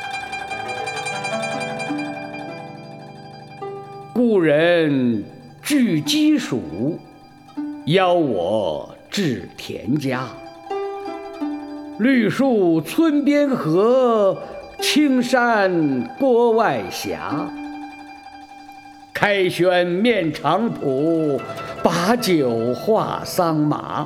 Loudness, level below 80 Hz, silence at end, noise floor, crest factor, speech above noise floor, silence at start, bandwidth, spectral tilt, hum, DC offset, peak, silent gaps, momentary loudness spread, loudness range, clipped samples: -19 LUFS; -58 dBFS; 0 s; -42 dBFS; 20 dB; 24 dB; 0 s; 16 kHz; -5.5 dB/octave; none; under 0.1%; 0 dBFS; none; 18 LU; 7 LU; under 0.1%